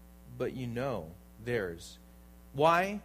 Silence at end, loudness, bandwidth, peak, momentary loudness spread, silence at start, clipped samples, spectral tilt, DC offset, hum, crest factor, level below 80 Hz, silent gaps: 0 s; -32 LUFS; 15.5 kHz; -14 dBFS; 22 LU; 0 s; under 0.1%; -6 dB/octave; under 0.1%; none; 20 dB; -56 dBFS; none